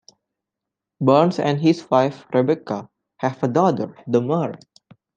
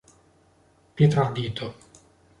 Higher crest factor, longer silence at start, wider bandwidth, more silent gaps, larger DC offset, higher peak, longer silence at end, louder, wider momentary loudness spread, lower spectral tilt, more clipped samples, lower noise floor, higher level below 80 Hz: about the same, 20 dB vs 20 dB; about the same, 1 s vs 0.95 s; second, 8.8 kHz vs 10.5 kHz; neither; neither; first, -2 dBFS vs -6 dBFS; about the same, 0.6 s vs 0.7 s; first, -20 LUFS vs -24 LUFS; second, 11 LU vs 17 LU; about the same, -7.5 dB/octave vs -7.5 dB/octave; neither; first, -85 dBFS vs -60 dBFS; second, -68 dBFS vs -56 dBFS